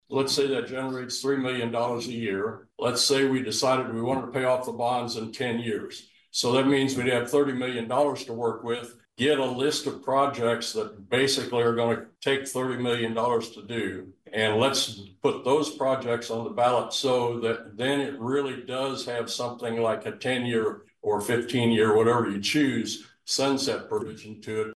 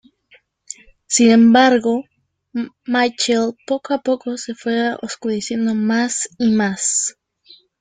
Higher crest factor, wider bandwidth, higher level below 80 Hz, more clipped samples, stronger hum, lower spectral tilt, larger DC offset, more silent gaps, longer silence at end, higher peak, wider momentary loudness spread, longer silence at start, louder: about the same, 16 dB vs 18 dB; first, 12.5 kHz vs 9.6 kHz; second, -70 dBFS vs -60 dBFS; neither; neither; about the same, -4 dB/octave vs -3.5 dB/octave; neither; neither; second, 0 s vs 0.7 s; second, -10 dBFS vs -2 dBFS; second, 9 LU vs 16 LU; second, 0.1 s vs 1.1 s; second, -26 LUFS vs -17 LUFS